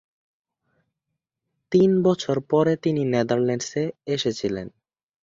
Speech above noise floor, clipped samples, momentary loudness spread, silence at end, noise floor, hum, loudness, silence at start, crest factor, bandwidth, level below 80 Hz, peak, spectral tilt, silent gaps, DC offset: 61 dB; under 0.1%; 9 LU; 0.55 s; -82 dBFS; none; -22 LUFS; 1.7 s; 18 dB; 7.8 kHz; -60 dBFS; -6 dBFS; -6 dB/octave; none; under 0.1%